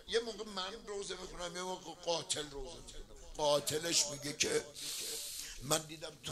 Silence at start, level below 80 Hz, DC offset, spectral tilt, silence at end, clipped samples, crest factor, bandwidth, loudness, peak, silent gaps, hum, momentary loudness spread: 0 s; -58 dBFS; under 0.1%; -2 dB/octave; 0 s; under 0.1%; 26 dB; 16 kHz; -37 LUFS; -12 dBFS; none; none; 15 LU